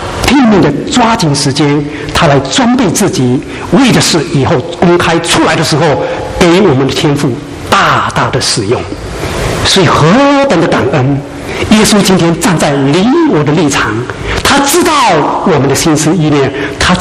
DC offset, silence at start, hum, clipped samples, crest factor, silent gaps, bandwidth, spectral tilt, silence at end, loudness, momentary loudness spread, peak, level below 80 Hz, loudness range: under 0.1%; 0 s; none; 0.3%; 8 dB; none; 16 kHz; -4.5 dB/octave; 0 s; -8 LUFS; 8 LU; 0 dBFS; -30 dBFS; 1 LU